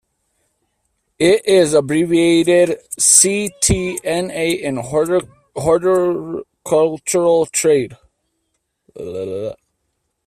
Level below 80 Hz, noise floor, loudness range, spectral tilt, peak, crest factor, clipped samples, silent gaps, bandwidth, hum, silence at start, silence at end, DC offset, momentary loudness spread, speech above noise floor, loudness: -42 dBFS; -71 dBFS; 5 LU; -3.5 dB/octave; 0 dBFS; 18 dB; under 0.1%; none; 16 kHz; none; 1.2 s; 0.75 s; under 0.1%; 15 LU; 56 dB; -15 LUFS